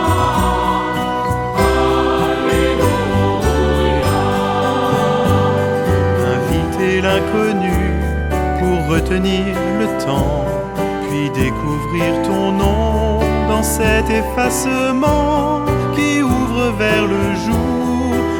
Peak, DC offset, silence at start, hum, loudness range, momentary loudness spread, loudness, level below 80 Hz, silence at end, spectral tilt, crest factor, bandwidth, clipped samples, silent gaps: -2 dBFS; under 0.1%; 0 s; none; 2 LU; 4 LU; -16 LUFS; -26 dBFS; 0 s; -6 dB/octave; 14 dB; 19.5 kHz; under 0.1%; none